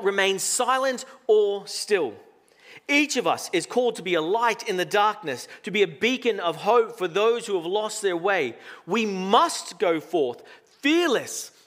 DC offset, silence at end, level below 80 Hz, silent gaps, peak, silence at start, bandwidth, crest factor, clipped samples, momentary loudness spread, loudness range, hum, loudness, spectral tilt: under 0.1%; 0.2 s; -84 dBFS; none; -4 dBFS; 0 s; 16 kHz; 20 dB; under 0.1%; 8 LU; 1 LU; none; -24 LUFS; -3 dB/octave